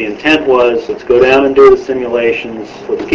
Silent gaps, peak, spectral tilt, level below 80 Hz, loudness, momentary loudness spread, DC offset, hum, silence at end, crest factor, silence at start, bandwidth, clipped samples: none; 0 dBFS; -5.5 dB/octave; -40 dBFS; -10 LUFS; 13 LU; under 0.1%; none; 0 s; 10 dB; 0 s; 7.6 kHz; 0.7%